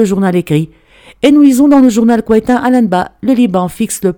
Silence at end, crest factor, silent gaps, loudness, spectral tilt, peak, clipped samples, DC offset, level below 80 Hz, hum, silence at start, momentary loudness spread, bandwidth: 0.05 s; 10 dB; none; -10 LUFS; -6 dB/octave; 0 dBFS; 0.4%; under 0.1%; -42 dBFS; none; 0 s; 8 LU; 18.5 kHz